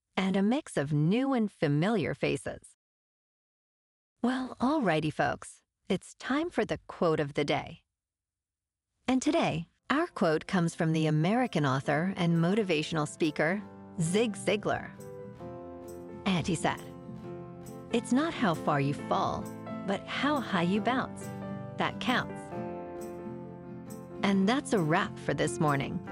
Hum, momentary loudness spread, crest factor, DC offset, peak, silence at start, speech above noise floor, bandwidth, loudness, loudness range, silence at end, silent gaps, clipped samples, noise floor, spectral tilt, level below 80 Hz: none; 16 LU; 18 dB; under 0.1%; -12 dBFS; 0.15 s; over 61 dB; 14.5 kHz; -30 LUFS; 5 LU; 0 s; 2.74-4.16 s; under 0.1%; under -90 dBFS; -6 dB/octave; -62 dBFS